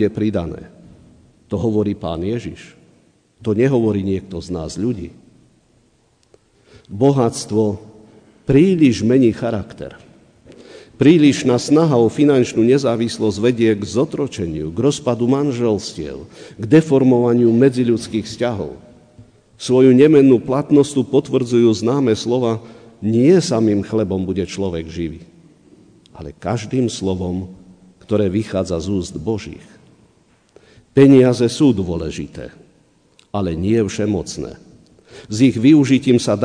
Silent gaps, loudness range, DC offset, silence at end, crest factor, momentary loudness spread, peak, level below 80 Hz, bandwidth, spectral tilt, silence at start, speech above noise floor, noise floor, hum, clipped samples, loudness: none; 9 LU; under 0.1%; 0 s; 16 dB; 17 LU; -2 dBFS; -46 dBFS; 10 kHz; -6.5 dB/octave; 0 s; 42 dB; -58 dBFS; none; under 0.1%; -16 LUFS